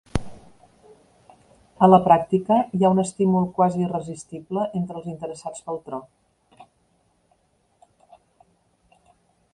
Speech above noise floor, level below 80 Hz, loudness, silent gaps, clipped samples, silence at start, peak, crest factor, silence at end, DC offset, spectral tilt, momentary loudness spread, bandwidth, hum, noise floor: 45 dB; -48 dBFS; -21 LUFS; none; under 0.1%; 0.15 s; -2 dBFS; 22 dB; 2.9 s; under 0.1%; -7.5 dB/octave; 18 LU; 11 kHz; none; -65 dBFS